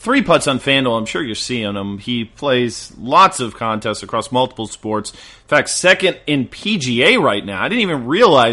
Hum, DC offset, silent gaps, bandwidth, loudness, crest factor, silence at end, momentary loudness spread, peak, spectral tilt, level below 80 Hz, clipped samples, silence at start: none; under 0.1%; none; 11.5 kHz; -16 LUFS; 16 dB; 0 s; 11 LU; 0 dBFS; -4 dB/octave; -48 dBFS; under 0.1%; 0 s